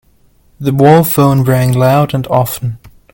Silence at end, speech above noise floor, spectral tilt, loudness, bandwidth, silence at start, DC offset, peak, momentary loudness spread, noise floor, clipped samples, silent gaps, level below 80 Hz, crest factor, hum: 0.25 s; 39 dB; -7 dB/octave; -11 LUFS; 17.5 kHz; 0.6 s; under 0.1%; 0 dBFS; 12 LU; -49 dBFS; 0.1%; none; -42 dBFS; 12 dB; none